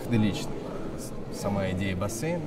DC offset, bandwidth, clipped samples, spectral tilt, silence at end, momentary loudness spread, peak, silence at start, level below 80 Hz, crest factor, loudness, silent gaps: under 0.1%; 16 kHz; under 0.1%; -6 dB/octave; 0 s; 10 LU; -12 dBFS; 0 s; -42 dBFS; 18 dB; -31 LUFS; none